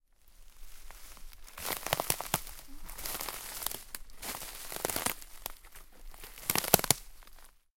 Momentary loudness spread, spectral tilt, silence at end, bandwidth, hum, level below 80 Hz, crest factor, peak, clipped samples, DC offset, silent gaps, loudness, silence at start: 25 LU; -2 dB/octave; 0.25 s; 17 kHz; none; -52 dBFS; 38 dB; 0 dBFS; under 0.1%; under 0.1%; none; -33 LUFS; 0.25 s